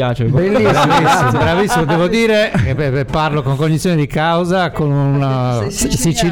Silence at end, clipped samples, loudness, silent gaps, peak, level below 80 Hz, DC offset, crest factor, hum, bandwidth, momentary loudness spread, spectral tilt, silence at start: 0 s; under 0.1%; -14 LUFS; none; -2 dBFS; -34 dBFS; 0.3%; 12 dB; none; 18 kHz; 5 LU; -5.5 dB/octave; 0 s